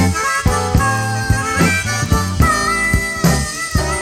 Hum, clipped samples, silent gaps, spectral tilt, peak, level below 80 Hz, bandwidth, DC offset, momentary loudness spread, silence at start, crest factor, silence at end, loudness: none; under 0.1%; none; -4.5 dB/octave; 0 dBFS; -24 dBFS; 16.5 kHz; under 0.1%; 4 LU; 0 s; 14 dB; 0 s; -16 LUFS